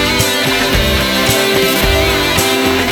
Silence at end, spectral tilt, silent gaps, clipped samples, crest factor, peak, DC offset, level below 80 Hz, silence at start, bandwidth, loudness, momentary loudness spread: 0 s; -3 dB/octave; none; under 0.1%; 12 dB; 0 dBFS; 0.2%; -24 dBFS; 0 s; over 20 kHz; -11 LUFS; 1 LU